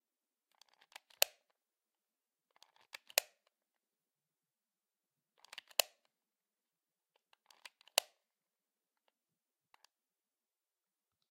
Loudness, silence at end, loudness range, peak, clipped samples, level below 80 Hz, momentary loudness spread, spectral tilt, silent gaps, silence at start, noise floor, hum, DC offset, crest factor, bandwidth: -36 LUFS; 5.5 s; 4 LU; -6 dBFS; under 0.1%; under -90 dBFS; 23 LU; 4 dB/octave; none; 1.2 s; under -90 dBFS; none; under 0.1%; 42 dB; 15.5 kHz